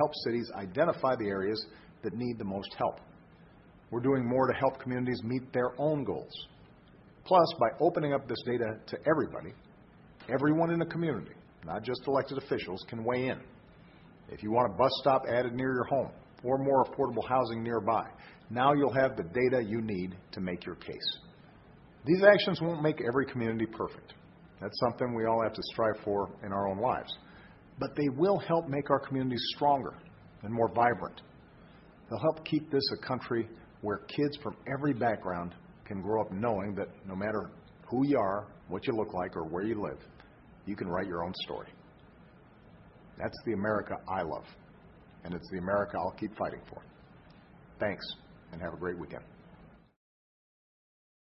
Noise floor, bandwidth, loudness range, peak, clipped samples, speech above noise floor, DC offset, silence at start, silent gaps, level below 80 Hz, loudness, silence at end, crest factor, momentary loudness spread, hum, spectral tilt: -57 dBFS; 5.8 kHz; 8 LU; -6 dBFS; under 0.1%; 26 dB; under 0.1%; 0 s; none; -60 dBFS; -32 LUFS; 1.6 s; 26 dB; 15 LU; none; -9.5 dB/octave